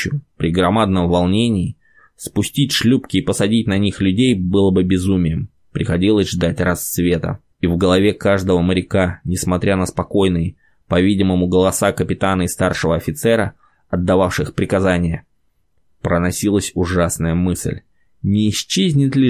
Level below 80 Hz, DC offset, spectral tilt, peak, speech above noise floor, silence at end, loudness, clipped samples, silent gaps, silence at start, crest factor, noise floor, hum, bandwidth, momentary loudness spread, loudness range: -34 dBFS; 0.1%; -5.5 dB/octave; -2 dBFS; 48 dB; 0 s; -17 LUFS; under 0.1%; none; 0 s; 14 dB; -65 dBFS; none; 16 kHz; 8 LU; 3 LU